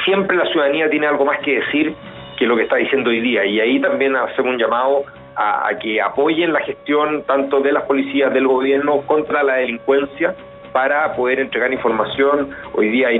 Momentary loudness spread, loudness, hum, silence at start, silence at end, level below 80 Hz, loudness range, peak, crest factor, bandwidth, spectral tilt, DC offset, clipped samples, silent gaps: 5 LU; -17 LUFS; none; 0 s; 0 s; -56 dBFS; 1 LU; -2 dBFS; 14 dB; 4.1 kHz; -7 dB/octave; under 0.1%; under 0.1%; none